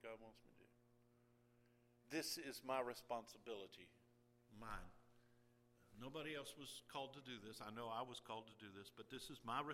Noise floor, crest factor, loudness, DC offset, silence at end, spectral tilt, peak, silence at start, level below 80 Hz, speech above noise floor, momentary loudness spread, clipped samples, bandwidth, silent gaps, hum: -76 dBFS; 24 dB; -52 LUFS; under 0.1%; 0 s; -3.5 dB/octave; -30 dBFS; 0 s; -74 dBFS; 24 dB; 14 LU; under 0.1%; 16 kHz; none; none